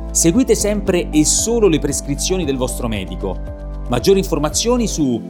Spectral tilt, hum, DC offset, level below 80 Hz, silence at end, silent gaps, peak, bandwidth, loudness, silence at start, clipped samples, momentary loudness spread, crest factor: -4 dB/octave; none; under 0.1%; -28 dBFS; 0 s; none; -2 dBFS; 19 kHz; -16 LUFS; 0 s; under 0.1%; 11 LU; 16 dB